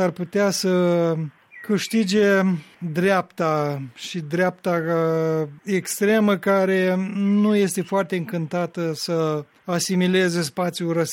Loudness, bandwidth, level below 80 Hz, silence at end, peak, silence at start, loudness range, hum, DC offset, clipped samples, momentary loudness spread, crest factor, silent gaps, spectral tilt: -22 LUFS; 16.5 kHz; -68 dBFS; 0 s; -8 dBFS; 0 s; 2 LU; none; under 0.1%; under 0.1%; 8 LU; 14 dB; none; -5.5 dB/octave